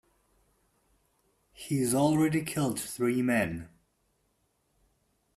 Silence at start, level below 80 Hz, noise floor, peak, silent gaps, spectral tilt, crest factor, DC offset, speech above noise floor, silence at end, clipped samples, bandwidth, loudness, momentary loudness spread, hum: 1.6 s; -64 dBFS; -74 dBFS; -14 dBFS; none; -5.5 dB/octave; 18 dB; under 0.1%; 46 dB; 1.7 s; under 0.1%; 15.5 kHz; -28 LUFS; 9 LU; none